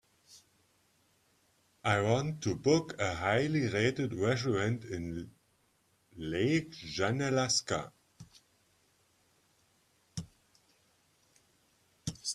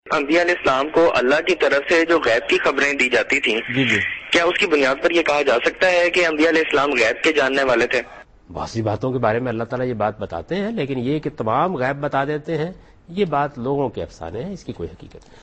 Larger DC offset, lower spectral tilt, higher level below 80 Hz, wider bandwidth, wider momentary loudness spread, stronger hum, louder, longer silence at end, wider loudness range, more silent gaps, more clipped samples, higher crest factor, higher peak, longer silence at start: neither; about the same, -4.5 dB/octave vs -4.5 dB/octave; second, -64 dBFS vs -50 dBFS; first, 13.5 kHz vs 8.8 kHz; first, 16 LU vs 13 LU; neither; second, -32 LUFS vs -18 LUFS; second, 0 s vs 0.25 s; first, 23 LU vs 7 LU; neither; neither; first, 22 dB vs 16 dB; second, -14 dBFS vs -4 dBFS; first, 0.3 s vs 0.05 s